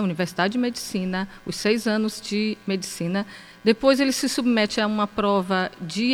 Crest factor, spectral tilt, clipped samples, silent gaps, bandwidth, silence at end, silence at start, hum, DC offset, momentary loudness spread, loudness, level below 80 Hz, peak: 18 dB; -4.5 dB/octave; under 0.1%; none; 16.5 kHz; 0 s; 0 s; none; under 0.1%; 8 LU; -23 LUFS; -56 dBFS; -4 dBFS